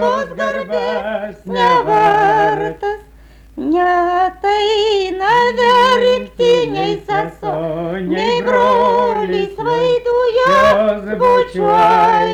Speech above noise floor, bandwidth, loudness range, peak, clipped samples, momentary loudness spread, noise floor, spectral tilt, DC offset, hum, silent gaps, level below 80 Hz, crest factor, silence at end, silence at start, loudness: 26 dB; 12 kHz; 2 LU; -4 dBFS; under 0.1%; 10 LU; -42 dBFS; -5 dB/octave; under 0.1%; none; none; -42 dBFS; 10 dB; 0 s; 0 s; -14 LUFS